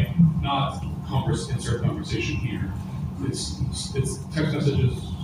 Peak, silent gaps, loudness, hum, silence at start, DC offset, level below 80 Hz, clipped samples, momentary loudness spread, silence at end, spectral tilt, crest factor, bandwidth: -8 dBFS; none; -26 LUFS; none; 0 s; under 0.1%; -38 dBFS; under 0.1%; 8 LU; 0 s; -6 dB/octave; 16 dB; 15 kHz